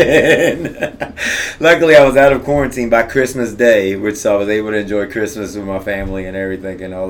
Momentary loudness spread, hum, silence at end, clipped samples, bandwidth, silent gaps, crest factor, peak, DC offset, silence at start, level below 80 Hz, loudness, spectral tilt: 14 LU; none; 0 s; 0.2%; 18.5 kHz; none; 14 dB; 0 dBFS; under 0.1%; 0 s; -36 dBFS; -14 LUFS; -4.5 dB/octave